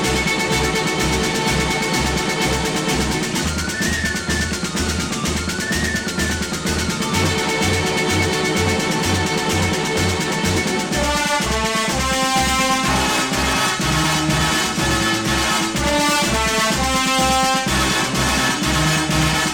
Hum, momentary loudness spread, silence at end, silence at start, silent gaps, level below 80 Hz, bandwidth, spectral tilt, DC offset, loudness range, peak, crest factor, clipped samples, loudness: none; 4 LU; 0 s; 0 s; none; -32 dBFS; 19.5 kHz; -3.5 dB/octave; under 0.1%; 3 LU; -4 dBFS; 14 dB; under 0.1%; -18 LUFS